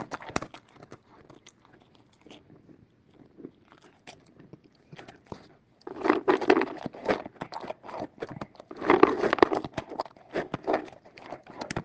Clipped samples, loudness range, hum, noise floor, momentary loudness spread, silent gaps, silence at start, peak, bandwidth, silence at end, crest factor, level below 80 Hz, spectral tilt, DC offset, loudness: under 0.1%; 11 LU; none; -60 dBFS; 26 LU; none; 0 s; 0 dBFS; 9 kHz; 0 s; 30 dB; -62 dBFS; -5.5 dB/octave; under 0.1%; -28 LUFS